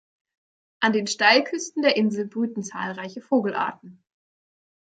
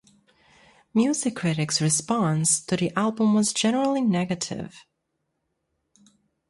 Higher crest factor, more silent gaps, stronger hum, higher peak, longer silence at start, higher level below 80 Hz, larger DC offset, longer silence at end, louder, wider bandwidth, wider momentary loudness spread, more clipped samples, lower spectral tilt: about the same, 22 dB vs 18 dB; neither; neither; first, -4 dBFS vs -8 dBFS; second, 0.8 s vs 0.95 s; second, -76 dBFS vs -64 dBFS; neither; second, 0.95 s vs 1.7 s; about the same, -23 LUFS vs -23 LUFS; second, 9.4 kHz vs 11.5 kHz; first, 13 LU vs 7 LU; neither; about the same, -3.5 dB/octave vs -4.5 dB/octave